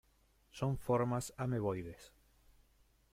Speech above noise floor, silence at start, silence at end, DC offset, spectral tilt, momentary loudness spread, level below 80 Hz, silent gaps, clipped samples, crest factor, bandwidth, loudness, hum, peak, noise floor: 35 dB; 0.55 s; 1.05 s; under 0.1%; -7 dB/octave; 18 LU; -62 dBFS; none; under 0.1%; 18 dB; 16 kHz; -38 LUFS; none; -22 dBFS; -71 dBFS